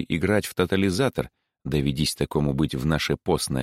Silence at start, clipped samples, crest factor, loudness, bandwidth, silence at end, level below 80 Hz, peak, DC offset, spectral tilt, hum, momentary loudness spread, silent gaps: 0 s; under 0.1%; 18 dB; -24 LUFS; 16.5 kHz; 0 s; -42 dBFS; -6 dBFS; under 0.1%; -5.5 dB/octave; none; 5 LU; none